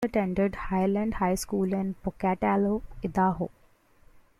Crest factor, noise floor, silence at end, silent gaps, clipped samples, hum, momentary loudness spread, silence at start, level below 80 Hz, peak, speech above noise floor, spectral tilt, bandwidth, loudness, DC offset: 16 dB; -58 dBFS; 0.9 s; none; under 0.1%; none; 7 LU; 0 s; -46 dBFS; -12 dBFS; 31 dB; -7 dB/octave; 13.5 kHz; -28 LUFS; under 0.1%